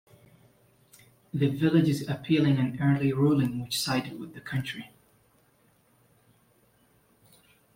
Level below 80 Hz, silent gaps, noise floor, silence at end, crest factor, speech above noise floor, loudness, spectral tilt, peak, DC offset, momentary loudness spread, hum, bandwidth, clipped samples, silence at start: -64 dBFS; none; -65 dBFS; 2.9 s; 20 dB; 39 dB; -27 LUFS; -6.5 dB/octave; -10 dBFS; under 0.1%; 14 LU; none; 16.5 kHz; under 0.1%; 1.35 s